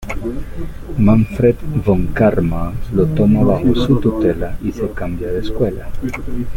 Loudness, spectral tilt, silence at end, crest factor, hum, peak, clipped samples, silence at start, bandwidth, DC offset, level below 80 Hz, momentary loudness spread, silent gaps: -17 LUFS; -8.5 dB/octave; 0 s; 14 dB; none; -2 dBFS; under 0.1%; 0 s; 16 kHz; under 0.1%; -26 dBFS; 12 LU; none